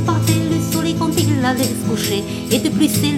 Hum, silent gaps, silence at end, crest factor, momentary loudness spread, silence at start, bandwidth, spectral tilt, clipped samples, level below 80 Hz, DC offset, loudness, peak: none; none; 0 s; 14 dB; 4 LU; 0 s; 17 kHz; -5 dB/octave; under 0.1%; -42 dBFS; under 0.1%; -17 LUFS; -2 dBFS